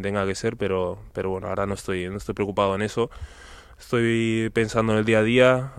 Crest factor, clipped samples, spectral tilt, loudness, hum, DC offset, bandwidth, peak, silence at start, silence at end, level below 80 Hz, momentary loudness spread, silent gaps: 20 dB; under 0.1%; -6 dB/octave; -24 LUFS; none; under 0.1%; 14 kHz; -4 dBFS; 0 s; 0 s; -46 dBFS; 11 LU; none